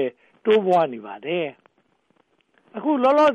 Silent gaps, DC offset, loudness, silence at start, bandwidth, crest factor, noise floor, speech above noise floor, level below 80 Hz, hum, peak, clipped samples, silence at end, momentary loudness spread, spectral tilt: none; under 0.1%; -22 LUFS; 0 s; 9 kHz; 14 dB; -65 dBFS; 46 dB; -72 dBFS; none; -8 dBFS; under 0.1%; 0 s; 14 LU; -6.5 dB/octave